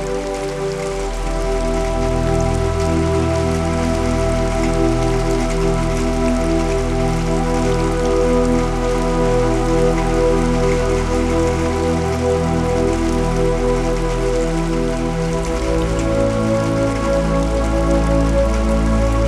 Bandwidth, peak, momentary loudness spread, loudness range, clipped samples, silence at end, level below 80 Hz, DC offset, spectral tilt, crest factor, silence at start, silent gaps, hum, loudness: 12.5 kHz; -4 dBFS; 4 LU; 2 LU; under 0.1%; 0 s; -22 dBFS; under 0.1%; -6.5 dB/octave; 14 dB; 0 s; none; none; -18 LUFS